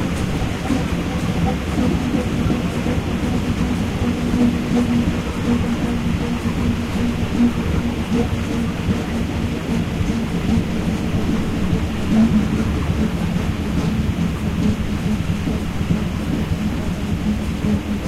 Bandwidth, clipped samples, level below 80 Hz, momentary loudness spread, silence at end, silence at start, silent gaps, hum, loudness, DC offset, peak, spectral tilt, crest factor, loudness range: 15.5 kHz; under 0.1%; -28 dBFS; 4 LU; 0 s; 0 s; none; none; -20 LUFS; under 0.1%; -8 dBFS; -6.5 dB/octave; 12 dB; 2 LU